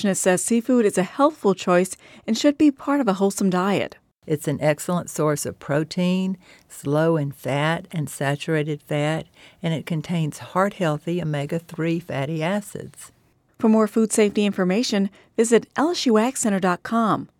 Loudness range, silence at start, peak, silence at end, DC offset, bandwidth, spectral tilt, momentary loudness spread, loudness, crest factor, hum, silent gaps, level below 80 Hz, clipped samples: 5 LU; 0 s; -4 dBFS; 0.15 s; under 0.1%; 17.5 kHz; -5.5 dB/octave; 8 LU; -22 LUFS; 18 dB; none; none; -62 dBFS; under 0.1%